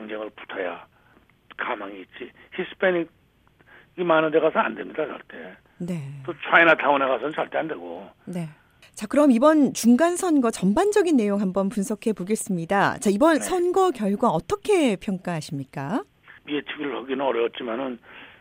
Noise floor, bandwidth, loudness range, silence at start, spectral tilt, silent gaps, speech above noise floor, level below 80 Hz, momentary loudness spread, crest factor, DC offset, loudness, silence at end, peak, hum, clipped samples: -59 dBFS; 16 kHz; 8 LU; 0 s; -5 dB/octave; none; 36 dB; -58 dBFS; 18 LU; 20 dB; under 0.1%; -23 LUFS; 0.15 s; -4 dBFS; none; under 0.1%